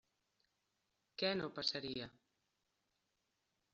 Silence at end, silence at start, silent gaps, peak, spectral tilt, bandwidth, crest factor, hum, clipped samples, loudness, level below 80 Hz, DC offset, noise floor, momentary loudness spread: 1.65 s; 1.2 s; none; -22 dBFS; -2 dB/octave; 7.4 kHz; 24 dB; none; under 0.1%; -41 LUFS; -78 dBFS; under 0.1%; -86 dBFS; 14 LU